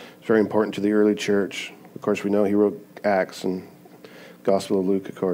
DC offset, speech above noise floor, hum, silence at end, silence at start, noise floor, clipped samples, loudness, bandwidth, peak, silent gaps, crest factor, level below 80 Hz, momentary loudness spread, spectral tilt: under 0.1%; 24 dB; none; 0 s; 0 s; -46 dBFS; under 0.1%; -23 LUFS; 16 kHz; -6 dBFS; none; 18 dB; -74 dBFS; 9 LU; -6 dB/octave